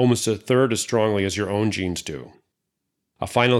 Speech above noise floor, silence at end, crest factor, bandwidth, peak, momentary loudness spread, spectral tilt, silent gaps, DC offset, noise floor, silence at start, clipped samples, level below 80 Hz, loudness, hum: 58 dB; 0 s; 18 dB; 14.5 kHz; -4 dBFS; 12 LU; -5 dB/octave; none; under 0.1%; -79 dBFS; 0 s; under 0.1%; -58 dBFS; -22 LUFS; none